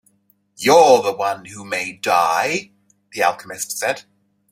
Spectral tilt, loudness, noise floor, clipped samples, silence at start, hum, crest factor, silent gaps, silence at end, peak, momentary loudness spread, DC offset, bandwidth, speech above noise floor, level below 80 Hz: -2.5 dB/octave; -18 LUFS; -61 dBFS; under 0.1%; 0.6 s; none; 18 dB; none; 0.5 s; 0 dBFS; 15 LU; under 0.1%; 16 kHz; 44 dB; -66 dBFS